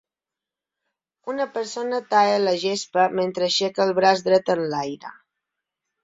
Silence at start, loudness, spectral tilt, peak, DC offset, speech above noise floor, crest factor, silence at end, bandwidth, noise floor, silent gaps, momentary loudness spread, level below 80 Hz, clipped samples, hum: 1.25 s; -22 LUFS; -4 dB/octave; -2 dBFS; under 0.1%; 67 dB; 20 dB; 0.9 s; 8 kHz; -89 dBFS; none; 13 LU; -68 dBFS; under 0.1%; none